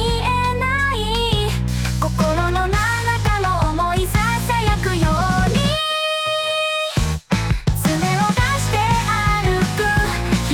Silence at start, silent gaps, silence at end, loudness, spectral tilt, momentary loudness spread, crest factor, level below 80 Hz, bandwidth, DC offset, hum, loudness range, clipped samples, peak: 0 s; none; 0 s; -19 LUFS; -4.5 dB/octave; 3 LU; 12 dB; -26 dBFS; 19 kHz; under 0.1%; none; 1 LU; under 0.1%; -6 dBFS